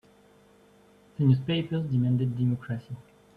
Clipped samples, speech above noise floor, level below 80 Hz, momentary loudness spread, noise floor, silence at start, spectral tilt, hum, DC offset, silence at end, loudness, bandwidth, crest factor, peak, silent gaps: under 0.1%; 32 dB; -62 dBFS; 19 LU; -58 dBFS; 1.2 s; -9 dB/octave; 50 Hz at -55 dBFS; under 0.1%; 0.35 s; -27 LUFS; 4.7 kHz; 18 dB; -10 dBFS; none